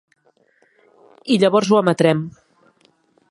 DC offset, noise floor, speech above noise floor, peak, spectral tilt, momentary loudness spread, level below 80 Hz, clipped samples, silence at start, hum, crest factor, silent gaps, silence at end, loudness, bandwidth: under 0.1%; -59 dBFS; 44 dB; 0 dBFS; -6 dB/octave; 16 LU; -66 dBFS; under 0.1%; 1.25 s; none; 20 dB; none; 1 s; -17 LUFS; 11.5 kHz